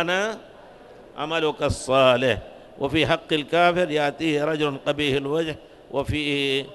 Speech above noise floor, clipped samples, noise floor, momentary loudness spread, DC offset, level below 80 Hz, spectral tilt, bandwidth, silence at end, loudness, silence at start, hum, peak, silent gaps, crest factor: 23 dB; under 0.1%; -46 dBFS; 12 LU; under 0.1%; -48 dBFS; -5 dB/octave; 12 kHz; 0 s; -23 LUFS; 0 s; none; -4 dBFS; none; 20 dB